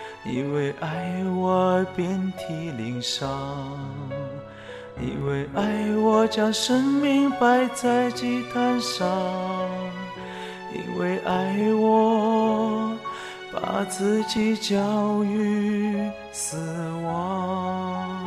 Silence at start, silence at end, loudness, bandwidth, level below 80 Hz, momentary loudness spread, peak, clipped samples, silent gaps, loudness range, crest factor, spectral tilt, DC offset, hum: 0 s; 0 s; -24 LUFS; 13.5 kHz; -56 dBFS; 13 LU; -8 dBFS; under 0.1%; none; 6 LU; 16 dB; -5.5 dB/octave; under 0.1%; none